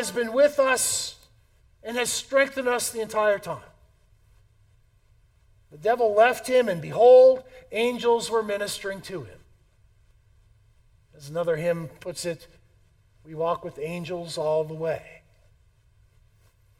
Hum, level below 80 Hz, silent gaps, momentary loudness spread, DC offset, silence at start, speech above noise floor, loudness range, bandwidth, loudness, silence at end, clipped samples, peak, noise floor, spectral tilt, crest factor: none; -60 dBFS; none; 16 LU; under 0.1%; 0 s; 37 dB; 12 LU; 16.5 kHz; -23 LUFS; 1.7 s; under 0.1%; -6 dBFS; -60 dBFS; -3 dB/octave; 20 dB